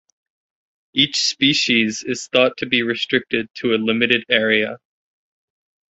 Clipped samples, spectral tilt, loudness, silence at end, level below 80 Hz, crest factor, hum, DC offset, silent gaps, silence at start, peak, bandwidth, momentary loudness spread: under 0.1%; -3 dB/octave; -18 LUFS; 1.15 s; -62 dBFS; 20 dB; none; under 0.1%; 3.50-3.54 s; 0.95 s; 0 dBFS; 8.2 kHz; 8 LU